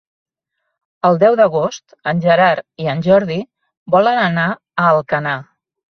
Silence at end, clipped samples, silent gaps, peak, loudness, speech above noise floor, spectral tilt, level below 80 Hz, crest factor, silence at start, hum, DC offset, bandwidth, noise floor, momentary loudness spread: 0.55 s; under 0.1%; 3.77-3.86 s; -2 dBFS; -15 LUFS; 60 dB; -6.5 dB/octave; -58 dBFS; 14 dB; 1.05 s; none; under 0.1%; 6.6 kHz; -74 dBFS; 11 LU